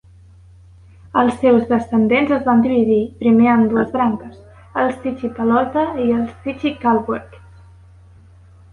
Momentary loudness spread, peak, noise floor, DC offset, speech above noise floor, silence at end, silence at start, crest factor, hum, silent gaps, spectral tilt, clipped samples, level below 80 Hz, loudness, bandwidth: 10 LU; -2 dBFS; -45 dBFS; under 0.1%; 29 dB; 1.35 s; 1.15 s; 16 dB; none; none; -8 dB/octave; under 0.1%; -46 dBFS; -17 LUFS; 9.4 kHz